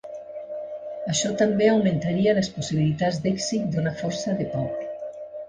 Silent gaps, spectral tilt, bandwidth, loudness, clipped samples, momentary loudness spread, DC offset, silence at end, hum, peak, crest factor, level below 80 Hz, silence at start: none; -5.5 dB/octave; 10 kHz; -24 LUFS; under 0.1%; 15 LU; under 0.1%; 0 s; none; -8 dBFS; 16 dB; -56 dBFS; 0.05 s